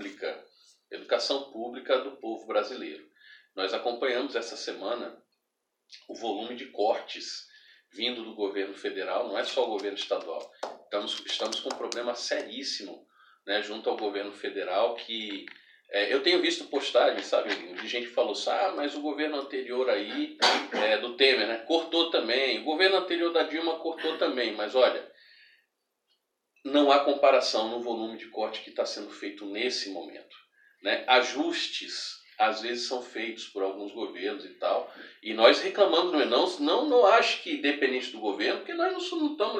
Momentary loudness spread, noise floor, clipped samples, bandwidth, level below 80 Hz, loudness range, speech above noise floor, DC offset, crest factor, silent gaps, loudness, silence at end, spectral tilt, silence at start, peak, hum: 14 LU; -82 dBFS; under 0.1%; 11 kHz; under -90 dBFS; 9 LU; 54 dB; under 0.1%; 24 dB; none; -28 LUFS; 0 s; -2 dB/octave; 0 s; -4 dBFS; none